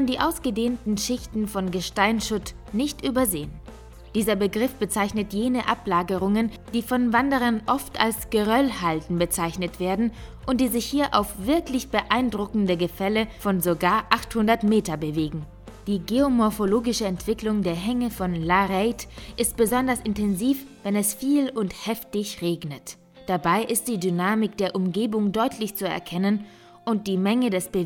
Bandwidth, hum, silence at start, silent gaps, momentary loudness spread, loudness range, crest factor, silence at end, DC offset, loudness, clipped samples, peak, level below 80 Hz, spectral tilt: over 20 kHz; none; 0 s; none; 7 LU; 3 LU; 24 dB; 0 s; under 0.1%; -24 LUFS; under 0.1%; 0 dBFS; -46 dBFS; -4.5 dB/octave